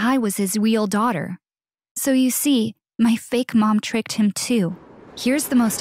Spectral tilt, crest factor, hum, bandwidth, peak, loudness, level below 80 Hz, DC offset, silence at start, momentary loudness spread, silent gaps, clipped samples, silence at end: -4.5 dB/octave; 12 dB; none; 16 kHz; -8 dBFS; -20 LUFS; -64 dBFS; under 0.1%; 0 s; 9 LU; 1.91-1.95 s; under 0.1%; 0 s